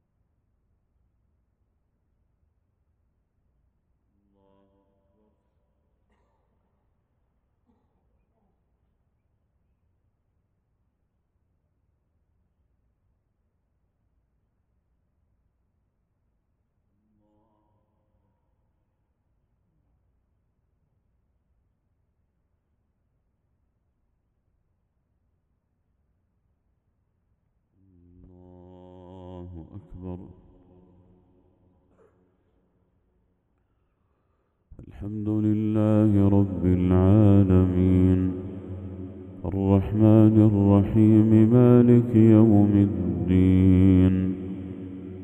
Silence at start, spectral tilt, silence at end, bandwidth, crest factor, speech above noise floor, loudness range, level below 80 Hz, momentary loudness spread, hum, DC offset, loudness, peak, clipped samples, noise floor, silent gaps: 29.15 s; -11.5 dB/octave; 0 s; 3.7 kHz; 22 dB; 55 dB; 9 LU; -52 dBFS; 22 LU; none; under 0.1%; -20 LUFS; -4 dBFS; under 0.1%; -73 dBFS; none